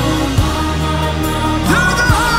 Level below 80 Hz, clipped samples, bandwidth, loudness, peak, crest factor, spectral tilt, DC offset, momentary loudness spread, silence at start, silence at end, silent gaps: -22 dBFS; under 0.1%; 16.5 kHz; -15 LUFS; -2 dBFS; 12 dB; -4.5 dB/octave; under 0.1%; 5 LU; 0 s; 0 s; none